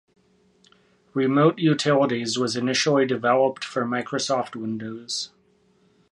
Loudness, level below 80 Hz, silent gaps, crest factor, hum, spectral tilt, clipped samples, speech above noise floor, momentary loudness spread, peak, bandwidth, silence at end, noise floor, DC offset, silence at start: -23 LUFS; -70 dBFS; none; 20 dB; none; -4.5 dB/octave; under 0.1%; 39 dB; 11 LU; -4 dBFS; 11.5 kHz; 0.85 s; -62 dBFS; under 0.1%; 1.15 s